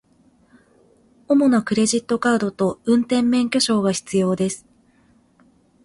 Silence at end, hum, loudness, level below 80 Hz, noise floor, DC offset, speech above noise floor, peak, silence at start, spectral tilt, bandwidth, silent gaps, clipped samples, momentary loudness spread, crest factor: 1.3 s; none; -19 LUFS; -58 dBFS; -57 dBFS; under 0.1%; 39 dB; -6 dBFS; 1.3 s; -4.5 dB/octave; 11.5 kHz; none; under 0.1%; 5 LU; 16 dB